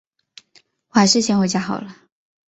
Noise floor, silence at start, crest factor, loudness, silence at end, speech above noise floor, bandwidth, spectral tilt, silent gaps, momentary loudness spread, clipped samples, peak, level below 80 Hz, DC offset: -57 dBFS; 0.95 s; 20 dB; -18 LUFS; 0.6 s; 40 dB; 8.2 kHz; -4 dB/octave; none; 14 LU; under 0.1%; -2 dBFS; -60 dBFS; under 0.1%